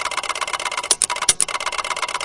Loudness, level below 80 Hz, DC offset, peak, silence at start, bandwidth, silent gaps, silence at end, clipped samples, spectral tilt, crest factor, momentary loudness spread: -19 LUFS; -54 dBFS; under 0.1%; 0 dBFS; 0 s; 12 kHz; none; 0 s; under 0.1%; 1.5 dB/octave; 22 dB; 7 LU